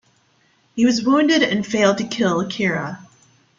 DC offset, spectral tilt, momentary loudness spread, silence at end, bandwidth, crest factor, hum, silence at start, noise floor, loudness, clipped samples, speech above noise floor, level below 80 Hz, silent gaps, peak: under 0.1%; -4.5 dB/octave; 13 LU; 0.55 s; 7.6 kHz; 16 dB; none; 0.75 s; -60 dBFS; -18 LUFS; under 0.1%; 42 dB; -60 dBFS; none; -4 dBFS